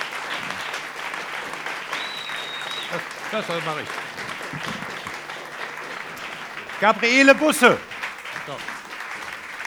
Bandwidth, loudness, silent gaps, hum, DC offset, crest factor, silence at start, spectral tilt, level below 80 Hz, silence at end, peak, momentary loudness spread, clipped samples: over 20 kHz; -24 LUFS; none; none; under 0.1%; 24 dB; 0 s; -3 dB/octave; -66 dBFS; 0 s; 0 dBFS; 17 LU; under 0.1%